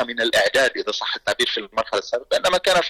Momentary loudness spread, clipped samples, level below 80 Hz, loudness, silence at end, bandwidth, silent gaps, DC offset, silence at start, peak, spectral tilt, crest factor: 7 LU; under 0.1%; -54 dBFS; -20 LUFS; 0 s; 17.5 kHz; none; under 0.1%; 0 s; -10 dBFS; -1.5 dB/octave; 10 dB